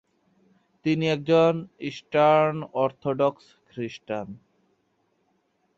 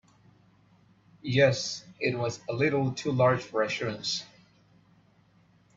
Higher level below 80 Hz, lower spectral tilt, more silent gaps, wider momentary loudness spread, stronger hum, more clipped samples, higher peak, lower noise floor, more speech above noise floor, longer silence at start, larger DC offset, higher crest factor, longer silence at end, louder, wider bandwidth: about the same, -68 dBFS vs -66 dBFS; first, -7 dB/octave vs -5 dB/octave; neither; first, 16 LU vs 9 LU; neither; neither; about the same, -8 dBFS vs -10 dBFS; first, -70 dBFS vs -63 dBFS; first, 47 dB vs 35 dB; second, 0.85 s vs 1.25 s; neither; about the same, 18 dB vs 20 dB; about the same, 1.4 s vs 1.5 s; first, -24 LUFS vs -28 LUFS; about the same, 7.6 kHz vs 7.8 kHz